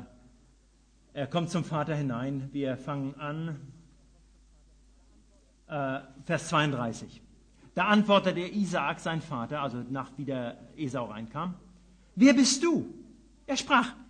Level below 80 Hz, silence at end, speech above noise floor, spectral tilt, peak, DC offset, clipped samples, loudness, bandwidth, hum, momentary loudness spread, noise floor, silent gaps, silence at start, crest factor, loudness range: -60 dBFS; 0.05 s; 33 dB; -4.5 dB/octave; -10 dBFS; under 0.1%; under 0.1%; -29 LUFS; 10 kHz; none; 16 LU; -62 dBFS; none; 0 s; 22 dB; 11 LU